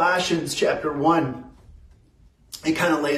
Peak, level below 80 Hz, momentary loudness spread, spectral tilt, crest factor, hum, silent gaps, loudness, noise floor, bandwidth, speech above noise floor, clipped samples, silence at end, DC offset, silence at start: -6 dBFS; -54 dBFS; 11 LU; -4.5 dB/octave; 16 dB; none; none; -22 LUFS; -55 dBFS; 15 kHz; 33 dB; under 0.1%; 0 s; under 0.1%; 0 s